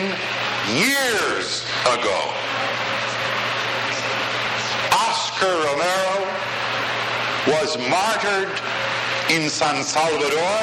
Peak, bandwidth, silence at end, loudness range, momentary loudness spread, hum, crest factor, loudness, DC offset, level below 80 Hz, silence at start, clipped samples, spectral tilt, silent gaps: -4 dBFS; 16 kHz; 0 s; 1 LU; 4 LU; none; 16 dB; -20 LUFS; under 0.1%; -60 dBFS; 0 s; under 0.1%; -2.5 dB/octave; none